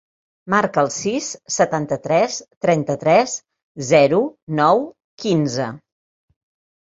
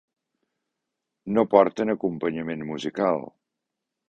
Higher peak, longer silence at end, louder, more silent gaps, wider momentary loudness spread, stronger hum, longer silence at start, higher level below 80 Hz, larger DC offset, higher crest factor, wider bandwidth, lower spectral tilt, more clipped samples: about the same, -2 dBFS vs -2 dBFS; first, 1.1 s vs 0.8 s; first, -19 LUFS vs -24 LUFS; first, 2.57-2.61 s, 3.62-3.75 s, 4.42-4.47 s, 5.04-5.18 s vs none; about the same, 10 LU vs 12 LU; neither; second, 0.45 s vs 1.25 s; about the same, -60 dBFS vs -64 dBFS; neither; second, 18 dB vs 24 dB; about the same, 8 kHz vs 8.2 kHz; second, -4.5 dB/octave vs -7 dB/octave; neither